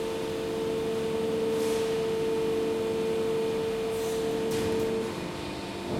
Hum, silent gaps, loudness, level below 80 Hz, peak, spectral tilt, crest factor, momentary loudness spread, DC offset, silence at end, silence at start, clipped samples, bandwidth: none; none; -29 LUFS; -54 dBFS; -16 dBFS; -5 dB/octave; 12 dB; 5 LU; under 0.1%; 0 s; 0 s; under 0.1%; 16.5 kHz